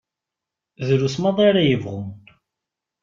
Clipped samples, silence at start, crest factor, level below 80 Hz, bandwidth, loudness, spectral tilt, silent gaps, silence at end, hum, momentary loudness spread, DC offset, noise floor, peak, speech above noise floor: under 0.1%; 0.8 s; 18 dB; -58 dBFS; 7.6 kHz; -19 LUFS; -6.5 dB/octave; none; 0.85 s; none; 15 LU; under 0.1%; -85 dBFS; -4 dBFS; 67 dB